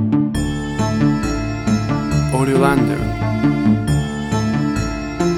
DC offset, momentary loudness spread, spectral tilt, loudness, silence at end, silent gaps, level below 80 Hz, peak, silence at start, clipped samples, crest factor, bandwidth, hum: under 0.1%; 6 LU; -7 dB/octave; -18 LUFS; 0 s; none; -30 dBFS; -2 dBFS; 0 s; under 0.1%; 16 dB; 13.5 kHz; none